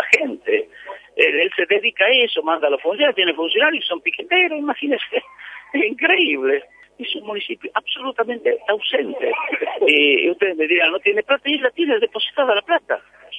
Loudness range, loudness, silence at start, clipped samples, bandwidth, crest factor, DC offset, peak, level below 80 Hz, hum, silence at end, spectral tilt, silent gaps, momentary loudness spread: 4 LU; -18 LUFS; 0 s; under 0.1%; 9.8 kHz; 20 dB; under 0.1%; 0 dBFS; -68 dBFS; none; 0 s; -2.5 dB/octave; none; 11 LU